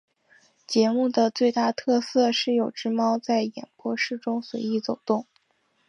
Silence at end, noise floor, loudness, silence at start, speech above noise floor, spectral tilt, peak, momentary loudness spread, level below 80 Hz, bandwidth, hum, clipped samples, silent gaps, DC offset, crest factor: 0.65 s; -69 dBFS; -25 LUFS; 0.7 s; 45 dB; -4.5 dB/octave; -8 dBFS; 7 LU; -78 dBFS; 7.8 kHz; none; under 0.1%; none; under 0.1%; 16 dB